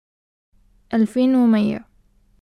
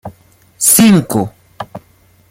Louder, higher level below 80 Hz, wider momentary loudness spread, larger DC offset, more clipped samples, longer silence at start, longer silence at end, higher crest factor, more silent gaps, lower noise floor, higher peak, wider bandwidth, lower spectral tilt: second, -18 LUFS vs -10 LUFS; second, -56 dBFS vs -50 dBFS; second, 9 LU vs 22 LU; neither; neither; first, 0.9 s vs 0.05 s; about the same, 0.6 s vs 0.55 s; about the same, 14 dB vs 14 dB; neither; first, -57 dBFS vs -49 dBFS; second, -6 dBFS vs 0 dBFS; second, 10 kHz vs 17 kHz; first, -7.5 dB/octave vs -4 dB/octave